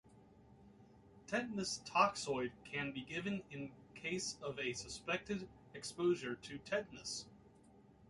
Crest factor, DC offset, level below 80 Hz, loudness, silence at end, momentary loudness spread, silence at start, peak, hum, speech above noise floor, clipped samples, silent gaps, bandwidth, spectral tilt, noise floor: 24 dB; under 0.1%; -70 dBFS; -41 LUFS; 0.05 s; 14 LU; 0.05 s; -18 dBFS; none; 24 dB; under 0.1%; none; 11.5 kHz; -3.5 dB/octave; -65 dBFS